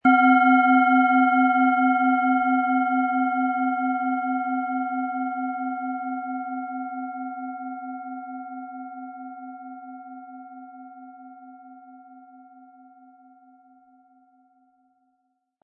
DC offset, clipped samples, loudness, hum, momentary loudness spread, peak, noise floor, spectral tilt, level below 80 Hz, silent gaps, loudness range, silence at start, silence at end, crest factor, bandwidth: under 0.1%; under 0.1%; -22 LUFS; none; 24 LU; -6 dBFS; -74 dBFS; -8 dB/octave; -78 dBFS; none; 23 LU; 0.05 s; 3.2 s; 18 dB; 3.3 kHz